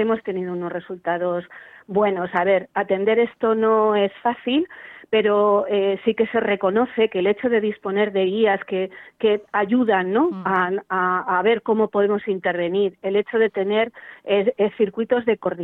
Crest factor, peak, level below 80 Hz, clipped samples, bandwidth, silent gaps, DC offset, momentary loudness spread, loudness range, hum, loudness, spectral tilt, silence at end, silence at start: 14 dB; -6 dBFS; -64 dBFS; under 0.1%; 4 kHz; none; under 0.1%; 8 LU; 2 LU; none; -21 LUFS; -8.5 dB/octave; 0 s; 0 s